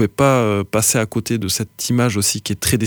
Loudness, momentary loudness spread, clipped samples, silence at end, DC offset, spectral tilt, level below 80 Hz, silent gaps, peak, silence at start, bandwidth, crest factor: -17 LUFS; 6 LU; under 0.1%; 0 s; under 0.1%; -4 dB/octave; -44 dBFS; none; -2 dBFS; 0 s; over 20 kHz; 16 dB